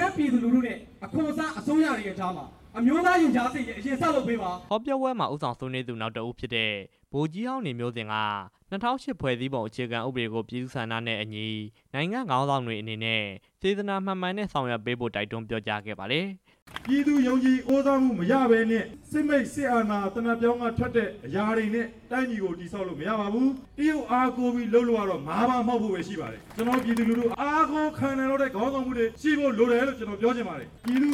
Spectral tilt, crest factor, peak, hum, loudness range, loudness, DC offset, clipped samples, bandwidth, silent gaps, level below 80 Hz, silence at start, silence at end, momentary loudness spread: -6 dB/octave; 18 dB; -10 dBFS; none; 6 LU; -27 LUFS; under 0.1%; under 0.1%; 14 kHz; 16.62-16.66 s; -56 dBFS; 0 s; 0 s; 10 LU